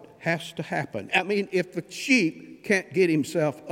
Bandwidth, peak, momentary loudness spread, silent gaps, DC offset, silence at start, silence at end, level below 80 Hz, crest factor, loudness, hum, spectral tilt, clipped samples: 16.5 kHz; -4 dBFS; 9 LU; none; under 0.1%; 0 s; 0 s; -72 dBFS; 22 dB; -25 LUFS; none; -5 dB/octave; under 0.1%